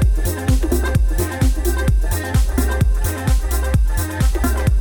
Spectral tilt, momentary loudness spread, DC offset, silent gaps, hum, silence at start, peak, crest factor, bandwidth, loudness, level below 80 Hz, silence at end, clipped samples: -6 dB/octave; 2 LU; under 0.1%; none; none; 0 s; -4 dBFS; 12 dB; over 20 kHz; -19 LUFS; -18 dBFS; 0 s; under 0.1%